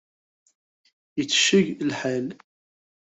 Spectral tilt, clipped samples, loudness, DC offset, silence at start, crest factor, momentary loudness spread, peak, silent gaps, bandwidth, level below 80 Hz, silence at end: -3 dB/octave; under 0.1%; -23 LUFS; under 0.1%; 1.15 s; 22 dB; 15 LU; -4 dBFS; none; 8.2 kHz; -68 dBFS; 0.85 s